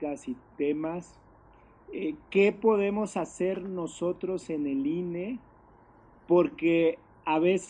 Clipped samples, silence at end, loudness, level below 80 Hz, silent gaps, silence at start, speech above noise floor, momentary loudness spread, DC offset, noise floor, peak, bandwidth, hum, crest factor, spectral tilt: under 0.1%; 0 s; -29 LUFS; -64 dBFS; none; 0 s; 29 dB; 12 LU; under 0.1%; -57 dBFS; -12 dBFS; 10 kHz; none; 18 dB; -6.5 dB/octave